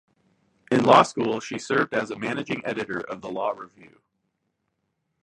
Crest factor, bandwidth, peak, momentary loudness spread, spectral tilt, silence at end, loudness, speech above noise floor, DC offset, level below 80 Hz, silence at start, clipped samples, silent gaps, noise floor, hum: 24 dB; 11.5 kHz; -2 dBFS; 15 LU; -5 dB/octave; 1.55 s; -24 LUFS; 52 dB; under 0.1%; -66 dBFS; 0.7 s; under 0.1%; none; -77 dBFS; none